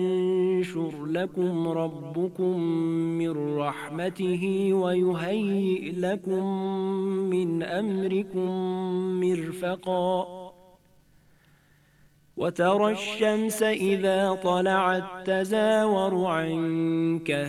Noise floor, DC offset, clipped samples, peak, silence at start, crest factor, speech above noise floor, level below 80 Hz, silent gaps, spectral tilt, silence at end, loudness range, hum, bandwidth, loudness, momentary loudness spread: -60 dBFS; under 0.1%; under 0.1%; -10 dBFS; 0 s; 16 dB; 35 dB; -70 dBFS; none; -6 dB/octave; 0 s; 6 LU; none; 13.5 kHz; -26 LUFS; 7 LU